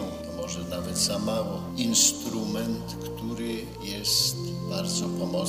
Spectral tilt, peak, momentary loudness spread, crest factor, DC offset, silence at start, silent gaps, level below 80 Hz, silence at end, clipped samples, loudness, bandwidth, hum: -3 dB/octave; -8 dBFS; 13 LU; 20 dB; under 0.1%; 0 s; none; -50 dBFS; 0 s; under 0.1%; -27 LUFS; 15.5 kHz; none